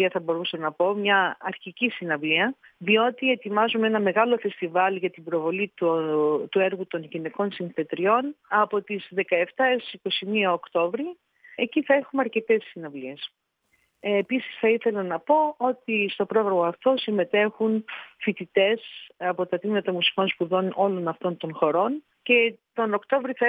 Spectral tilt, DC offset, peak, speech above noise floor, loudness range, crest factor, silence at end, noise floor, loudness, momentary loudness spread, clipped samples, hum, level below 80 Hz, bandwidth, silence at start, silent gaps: -7.5 dB/octave; under 0.1%; -6 dBFS; 45 dB; 3 LU; 18 dB; 0 s; -70 dBFS; -24 LUFS; 9 LU; under 0.1%; none; -84 dBFS; 4.9 kHz; 0 s; none